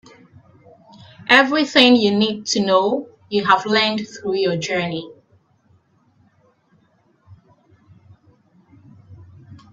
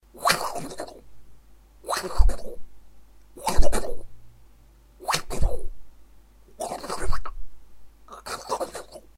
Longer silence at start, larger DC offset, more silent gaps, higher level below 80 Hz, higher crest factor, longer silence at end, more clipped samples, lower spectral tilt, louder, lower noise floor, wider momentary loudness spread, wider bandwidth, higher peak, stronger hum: first, 1.2 s vs 0.2 s; neither; neither; second, -64 dBFS vs -30 dBFS; about the same, 22 dB vs 22 dB; second, 0.2 s vs 0.35 s; neither; about the same, -4 dB/octave vs -3.5 dB/octave; first, -17 LUFS vs -29 LUFS; first, -60 dBFS vs -53 dBFS; second, 14 LU vs 18 LU; second, 8.6 kHz vs 15 kHz; about the same, 0 dBFS vs 0 dBFS; neither